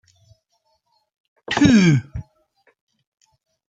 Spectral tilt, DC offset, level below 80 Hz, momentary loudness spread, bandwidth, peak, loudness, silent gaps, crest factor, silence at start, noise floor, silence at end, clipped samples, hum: -6 dB/octave; under 0.1%; -48 dBFS; 23 LU; 9.2 kHz; -2 dBFS; -16 LUFS; none; 20 dB; 1.5 s; -68 dBFS; 1.45 s; under 0.1%; none